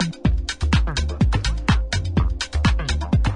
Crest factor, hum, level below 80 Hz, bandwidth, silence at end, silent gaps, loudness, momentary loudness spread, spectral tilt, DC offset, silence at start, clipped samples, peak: 14 dB; none; -24 dBFS; 10.5 kHz; 0 s; none; -22 LUFS; 3 LU; -5.5 dB/octave; under 0.1%; 0 s; under 0.1%; -6 dBFS